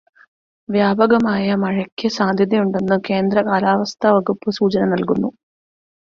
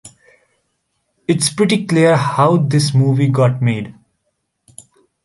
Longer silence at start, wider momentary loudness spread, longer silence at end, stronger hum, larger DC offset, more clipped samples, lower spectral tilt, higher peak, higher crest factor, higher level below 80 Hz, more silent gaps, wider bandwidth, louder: first, 0.7 s vs 0.05 s; about the same, 6 LU vs 8 LU; second, 0.85 s vs 1.35 s; neither; neither; neither; about the same, -6.5 dB/octave vs -6 dB/octave; about the same, -2 dBFS vs -2 dBFS; about the same, 16 dB vs 14 dB; about the same, -56 dBFS vs -56 dBFS; first, 1.92-1.97 s vs none; second, 7 kHz vs 11.5 kHz; second, -18 LUFS vs -14 LUFS